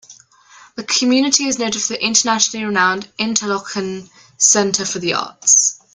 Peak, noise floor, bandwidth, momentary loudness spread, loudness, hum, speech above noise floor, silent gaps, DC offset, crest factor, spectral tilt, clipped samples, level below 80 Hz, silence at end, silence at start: 0 dBFS; -46 dBFS; 10.5 kHz; 12 LU; -15 LUFS; none; 29 dB; none; under 0.1%; 18 dB; -1.5 dB/octave; under 0.1%; -60 dBFS; 0.2 s; 0.1 s